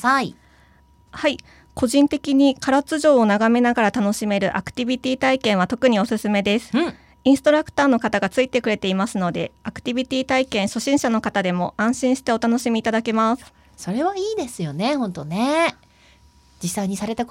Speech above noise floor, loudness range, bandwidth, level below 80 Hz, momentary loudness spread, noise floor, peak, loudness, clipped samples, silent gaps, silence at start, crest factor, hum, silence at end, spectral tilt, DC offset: 34 dB; 4 LU; 16 kHz; -52 dBFS; 9 LU; -54 dBFS; -4 dBFS; -20 LUFS; under 0.1%; none; 0 s; 16 dB; none; 0.05 s; -5 dB/octave; under 0.1%